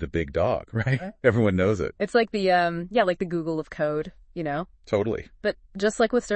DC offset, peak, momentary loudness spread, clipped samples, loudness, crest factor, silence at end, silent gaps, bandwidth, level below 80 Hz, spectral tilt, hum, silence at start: under 0.1%; -6 dBFS; 9 LU; under 0.1%; -25 LUFS; 20 dB; 0 s; none; 8.8 kHz; -50 dBFS; -6.5 dB/octave; none; 0 s